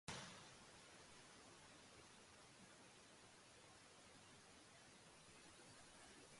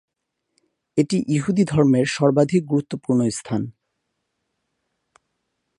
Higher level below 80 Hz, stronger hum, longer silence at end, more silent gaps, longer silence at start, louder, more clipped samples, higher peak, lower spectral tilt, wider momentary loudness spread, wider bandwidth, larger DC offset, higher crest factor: second, -82 dBFS vs -58 dBFS; neither; second, 0 s vs 2.1 s; neither; second, 0.05 s vs 0.95 s; second, -63 LUFS vs -20 LUFS; neither; second, -32 dBFS vs -2 dBFS; second, -2.5 dB/octave vs -6.5 dB/octave; second, 4 LU vs 9 LU; about the same, 11.5 kHz vs 11 kHz; neither; first, 30 dB vs 20 dB